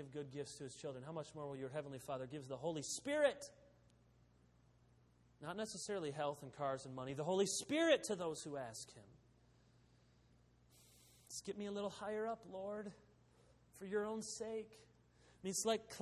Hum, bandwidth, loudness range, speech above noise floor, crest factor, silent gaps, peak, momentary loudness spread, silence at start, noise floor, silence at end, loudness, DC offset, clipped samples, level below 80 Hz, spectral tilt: none; 13 kHz; 9 LU; 28 dB; 24 dB; none; -22 dBFS; 13 LU; 0 s; -71 dBFS; 0 s; -43 LUFS; under 0.1%; under 0.1%; -78 dBFS; -3.5 dB/octave